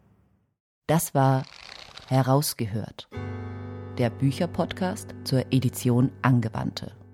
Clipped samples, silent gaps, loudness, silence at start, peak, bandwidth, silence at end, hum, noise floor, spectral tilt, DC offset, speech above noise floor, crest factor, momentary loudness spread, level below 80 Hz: under 0.1%; none; -26 LUFS; 0.9 s; -6 dBFS; 16.5 kHz; 0.1 s; none; -64 dBFS; -6 dB/octave; under 0.1%; 39 dB; 20 dB; 15 LU; -58 dBFS